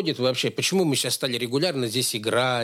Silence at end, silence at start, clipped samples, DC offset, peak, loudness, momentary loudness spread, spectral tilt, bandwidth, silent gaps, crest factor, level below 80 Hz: 0 s; 0 s; under 0.1%; under 0.1%; -10 dBFS; -23 LUFS; 2 LU; -3.5 dB/octave; 16.5 kHz; none; 14 dB; -70 dBFS